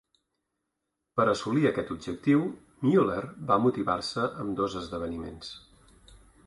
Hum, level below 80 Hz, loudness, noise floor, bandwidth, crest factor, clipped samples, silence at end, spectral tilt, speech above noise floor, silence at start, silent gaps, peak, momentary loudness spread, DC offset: none; -56 dBFS; -28 LUFS; -83 dBFS; 11.5 kHz; 20 dB; under 0.1%; 0.3 s; -6.5 dB/octave; 56 dB; 1.15 s; none; -10 dBFS; 12 LU; under 0.1%